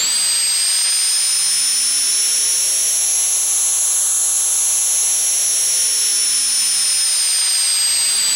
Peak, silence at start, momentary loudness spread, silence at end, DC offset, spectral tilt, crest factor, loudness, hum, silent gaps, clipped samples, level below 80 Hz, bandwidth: -6 dBFS; 0 s; 0 LU; 0 s; under 0.1%; 4.5 dB/octave; 10 dB; -13 LUFS; none; none; under 0.1%; -70 dBFS; 17 kHz